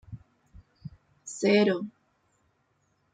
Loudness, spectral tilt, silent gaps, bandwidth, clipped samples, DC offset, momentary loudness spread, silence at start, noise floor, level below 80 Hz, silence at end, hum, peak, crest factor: -25 LUFS; -5 dB/octave; none; 9.4 kHz; under 0.1%; under 0.1%; 25 LU; 0.1 s; -72 dBFS; -62 dBFS; 1.25 s; none; -10 dBFS; 20 dB